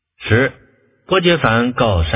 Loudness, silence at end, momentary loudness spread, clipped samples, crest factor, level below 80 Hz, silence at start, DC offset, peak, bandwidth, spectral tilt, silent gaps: -15 LUFS; 0 s; 5 LU; under 0.1%; 16 dB; -30 dBFS; 0.2 s; under 0.1%; 0 dBFS; 4 kHz; -10 dB/octave; none